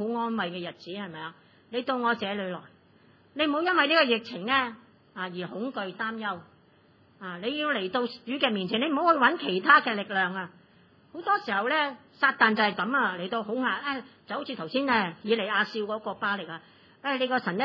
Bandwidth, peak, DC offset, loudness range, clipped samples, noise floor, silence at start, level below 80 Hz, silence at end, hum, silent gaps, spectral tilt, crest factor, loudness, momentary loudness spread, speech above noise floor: 6 kHz; -6 dBFS; under 0.1%; 8 LU; under 0.1%; -60 dBFS; 0 s; -82 dBFS; 0 s; none; none; -6.5 dB/octave; 22 dB; -27 LUFS; 16 LU; 33 dB